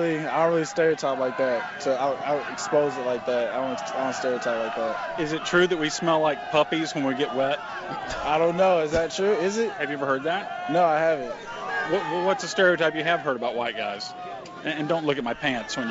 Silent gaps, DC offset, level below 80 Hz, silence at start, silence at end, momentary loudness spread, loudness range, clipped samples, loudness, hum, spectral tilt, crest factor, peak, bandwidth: none; under 0.1%; -56 dBFS; 0 s; 0 s; 8 LU; 2 LU; under 0.1%; -25 LUFS; none; -4.5 dB/octave; 16 dB; -8 dBFS; 8 kHz